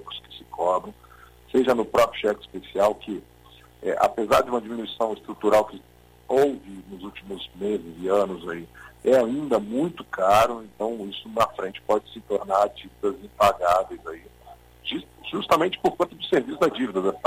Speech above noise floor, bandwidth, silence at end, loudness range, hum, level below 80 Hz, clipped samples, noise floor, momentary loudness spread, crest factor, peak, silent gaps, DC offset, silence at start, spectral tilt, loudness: 27 dB; 16 kHz; 0.1 s; 3 LU; 60 Hz at -55 dBFS; -54 dBFS; under 0.1%; -51 dBFS; 16 LU; 18 dB; -8 dBFS; none; under 0.1%; 0 s; -5 dB/octave; -24 LUFS